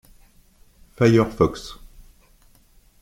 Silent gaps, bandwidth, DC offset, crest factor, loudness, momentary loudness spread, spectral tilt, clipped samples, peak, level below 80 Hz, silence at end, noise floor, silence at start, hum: none; 16 kHz; under 0.1%; 22 dB; -19 LUFS; 19 LU; -7 dB/octave; under 0.1%; -2 dBFS; -46 dBFS; 1.25 s; -55 dBFS; 1 s; none